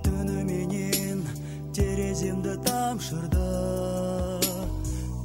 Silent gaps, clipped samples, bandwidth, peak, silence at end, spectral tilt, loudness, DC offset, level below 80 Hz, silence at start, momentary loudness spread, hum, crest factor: none; under 0.1%; 16 kHz; -8 dBFS; 0 s; -5 dB/octave; -28 LUFS; under 0.1%; -36 dBFS; 0 s; 5 LU; none; 20 dB